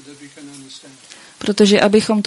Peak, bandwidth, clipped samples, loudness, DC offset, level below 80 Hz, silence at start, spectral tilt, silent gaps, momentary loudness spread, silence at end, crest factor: 0 dBFS; 11.5 kHz; under 0.1%; -14 LUFS; under 0.1%; -56 dBFS; 0.1 s; -4.5 dB/octave; none; 25 LU; 0.05 s; 16 dB